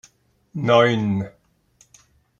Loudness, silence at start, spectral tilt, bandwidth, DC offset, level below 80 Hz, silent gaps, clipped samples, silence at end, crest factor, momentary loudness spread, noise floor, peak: -19 LUFS; 0.55 s; -6.5 dB/octave; 7.6 kHz; under 0.1%; -60 dBFS; none; under 0.1%; 1.1 s; 20 dB; 19 LU; -59 dBFS; -2 dBFS